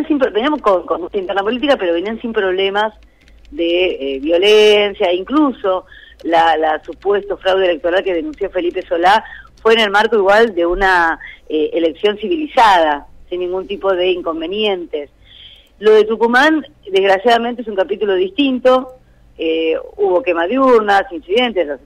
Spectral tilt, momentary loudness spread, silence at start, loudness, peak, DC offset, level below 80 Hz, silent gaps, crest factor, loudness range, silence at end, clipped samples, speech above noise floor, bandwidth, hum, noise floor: -4 dB/octave; 10 LU; 0 s; -15 LUFS; -4 dBFS; under 0.1%; -42 dBFS; none; 12 dB; 3 LU; 0.1 s; under 0.1%; 27 dB; 12.5 kHz; none; -41 dBFS